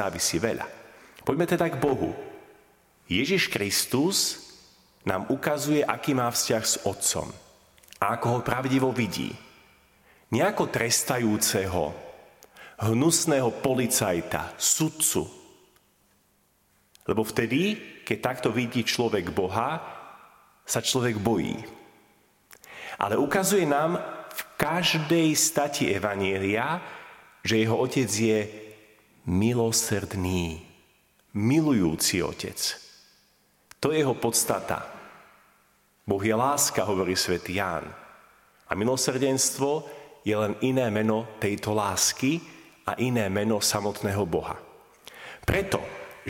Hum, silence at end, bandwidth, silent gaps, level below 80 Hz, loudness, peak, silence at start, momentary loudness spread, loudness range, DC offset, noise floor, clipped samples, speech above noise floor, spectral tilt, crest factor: none; 0 s; 17 kHz; none; -54 dBFS; -26 LUFS; -4 dBFS; 0 s; 13 LU; 4 LU; under 0.1%; -66 dBFS; under 0.1%; 41 dB; -3.5 dB/octave; 22 dB